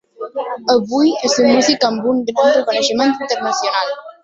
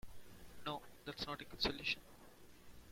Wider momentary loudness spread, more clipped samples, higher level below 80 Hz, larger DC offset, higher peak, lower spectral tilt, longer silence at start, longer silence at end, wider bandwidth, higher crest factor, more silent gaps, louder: second, 9 LU vs 23 LU; neither; about the same, -60 dBFS vs -62 dBFS; neither; first, -2 dBFS vs -24 dBFS; about the same, -3 dB/octave vs -3.5 dB/octave; first, 0.2 s vs 0.05 s; about the same, 0.1 s vs 0 s; second, 8 kHz vs 16.5 kHz; second, 14 dB vs 24 dB; neither; first, -15 LUFS vs -43 LUFS